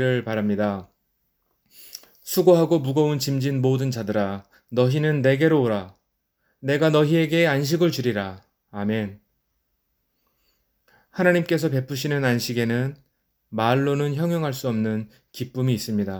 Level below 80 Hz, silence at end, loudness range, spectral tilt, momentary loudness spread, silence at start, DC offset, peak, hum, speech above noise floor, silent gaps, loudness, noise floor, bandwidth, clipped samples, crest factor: -64 dBFS; 0 s; 6 LU; -6.5 dB/octave; 15 LU; 0 s; under 0.1%; -4 dBFS; none; 52 dB; none; -22 LUFS; -73 dBFS; over 20 kHz; under 0.1%; 18 dB